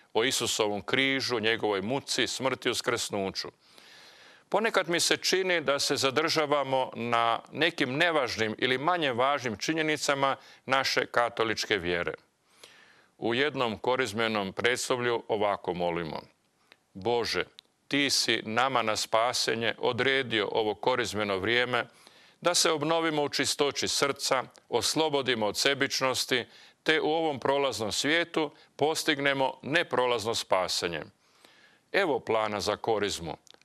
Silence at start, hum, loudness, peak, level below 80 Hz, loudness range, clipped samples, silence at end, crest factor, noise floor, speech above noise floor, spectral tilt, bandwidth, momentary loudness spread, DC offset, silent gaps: 0.15 s; none; -28 LUFS; -10 dBFS; -70 dBFS; 3 LU; under 0.1%; 0.3 s; 20 dB; -64 dBFS; 35 dB; -2.5 dB/octave; 13.5 kHz; 6 LU; under 0.1%; none